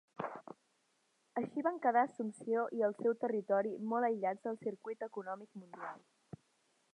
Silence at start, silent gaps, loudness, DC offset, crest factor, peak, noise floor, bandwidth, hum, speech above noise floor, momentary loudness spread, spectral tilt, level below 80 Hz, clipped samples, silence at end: 0.2 s; none; -37 LUFS; under 0.1%; 20 dB; -18 dBFS; -77 dBFS; 10 kHz; none; 41 dB; 20 LU; -7.5 dB/octave; -88 dBFS; under 0.1%; 0.95 s